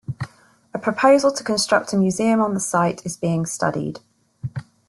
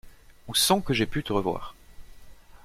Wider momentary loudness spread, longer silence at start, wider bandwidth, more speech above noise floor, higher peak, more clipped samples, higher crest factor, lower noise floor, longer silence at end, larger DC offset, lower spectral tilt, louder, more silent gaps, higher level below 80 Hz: first, 17 LU vs 13 LU; about the same, 0.1 s vs 0.05 s; second, 12.5 kHz vs 16.5 kHz; first, 29 dB vs 21 dB; first, -2 dBFS vs -8 dBFS; neither; about the same, 18 dB vs 20 dB; about the same, -48 dBFS vs -47 dBFS; first, 0.25 s vs 0.1 s; neither; first, -5 dB/octave vs -3.5 dB/octave; first, -20 LUFS vs -25 LUFS; neither; second, -58 dBFS vs -46 dBFS